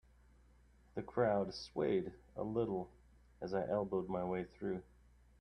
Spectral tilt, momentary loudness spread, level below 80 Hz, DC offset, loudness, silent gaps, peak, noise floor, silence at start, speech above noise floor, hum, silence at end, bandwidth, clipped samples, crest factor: -7.5 dB/octave; 13 LU; -64 dBFS; under 0.1%; -40 LUFS; none; -20 dBFS; -66 dBFS; 0.95 s; 28 dB; none; 0.55 s; 9.8 kHz; under 0.1%; 20 dB